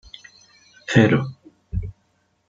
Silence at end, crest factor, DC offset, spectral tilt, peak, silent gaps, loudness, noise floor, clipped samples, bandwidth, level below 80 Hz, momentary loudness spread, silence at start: 0.6 s; 22 dB; under 0.1%; -6.5 dB/octave; -2 dBFS; none; -20 LUFS; -66 dBFS; under 0.1%; 7.8 kHz; -42 dBFS; 25 LU; 0.9 s